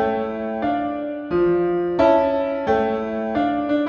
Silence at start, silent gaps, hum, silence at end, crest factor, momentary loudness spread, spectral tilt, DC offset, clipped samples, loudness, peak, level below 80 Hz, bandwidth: 0 s; none; none; 0 s; 16 dB; 8 LU; -8 dB/octave; under 0.1%; under 0.1%; -21 LUFS; -4 dBFS; -48 dBFS; 6.8 kHz